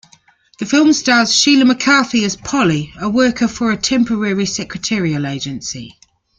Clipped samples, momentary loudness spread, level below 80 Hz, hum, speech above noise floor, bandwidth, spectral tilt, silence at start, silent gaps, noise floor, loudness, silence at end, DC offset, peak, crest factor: under 0.1%; 12 LU; -48 dBFS; none; 36 dB; 9.4 kHz; -3.5 dB/octave; 0.6 s; none; -51 dBFS; -14 LUFS; 0.5 s; under 0.1%; 0 dBFS; 14 dB